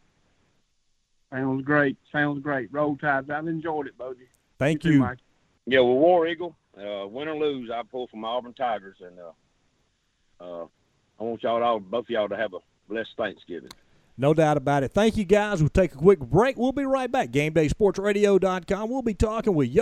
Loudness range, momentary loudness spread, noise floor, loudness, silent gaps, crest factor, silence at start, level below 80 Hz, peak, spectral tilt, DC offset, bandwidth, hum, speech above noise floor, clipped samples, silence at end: 10 LU; 18 LU; -70 dBFS; -24 LUFS; none; 22 dB; 1.3 s; -46 dBFS; -4 dBFS; -6.5 dB/octave; under 0.1%; 13 kHz; none; 46 dB; under 0.1%; 0 s